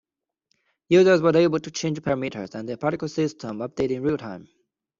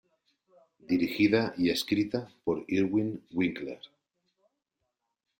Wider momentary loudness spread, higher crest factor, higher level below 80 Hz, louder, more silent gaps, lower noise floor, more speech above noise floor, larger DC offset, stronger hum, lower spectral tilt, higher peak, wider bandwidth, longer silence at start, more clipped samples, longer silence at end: first, 15 LU vs 8 LU; about the same, 18 dB vs 20 dB; first, -60 dBFS vs -66 dBFS; first, -23 LUFS vs -29 LUFS; neither; second, -74 dBFS vs -83 dBFS; about the same, 52 dB vs 55 dB; neither; neither; about the same, -6 dB/octave vs -6 dB/octave; first, -6 dBFS vs -12 dBFS; second, 7.6 kHz vs 16 kHz; about the same, 0.9 s vs 0.9 s; neither; second, 0.55 s vs 1.55 s